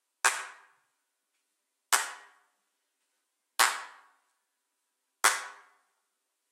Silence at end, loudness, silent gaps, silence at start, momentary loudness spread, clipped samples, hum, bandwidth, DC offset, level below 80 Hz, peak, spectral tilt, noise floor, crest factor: 0.95 s; -29 LUFS; none; 0.25 s; 19 LU; under 0.1%; none; 16 kHz; under 0.1%; under -90 dBFS; -6 dBFS; 4 dB/octave; -82 dBFS; 30 dB